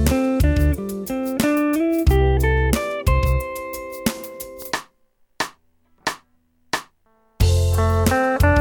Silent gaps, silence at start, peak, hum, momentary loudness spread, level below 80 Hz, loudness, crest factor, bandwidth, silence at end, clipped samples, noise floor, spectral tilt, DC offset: none; 0 s; -4 dBFS; none; 11 LU; -26 dBFS; -21 LUFS; 16 dB; 19 kHz; 0 s; under 0.1%; -61 dBFS; -6 dB/octave; under 0.1%